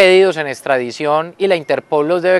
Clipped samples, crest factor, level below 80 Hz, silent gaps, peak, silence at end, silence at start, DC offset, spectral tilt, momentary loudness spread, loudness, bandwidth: 0.1%; 14 dB; -70 dBFS; none; 0 dBFS; 0 s; 0 s; under 0.1%; -5 dB/octave; 6 LU; -15 LUFS; 12.5 kHz